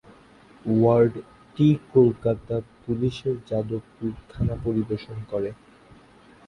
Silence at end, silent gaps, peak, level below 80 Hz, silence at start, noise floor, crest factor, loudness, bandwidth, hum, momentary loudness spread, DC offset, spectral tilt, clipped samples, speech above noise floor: 0.95 s; none; -6 dBFS; -48 dBFS; 0.65 s; -52 dBFS; 18 dB; -24 LUFS; 10.5 kHz; none; 14 LU; under 0.1%; -9.5 dB/octave; under 0.1%; 29 dB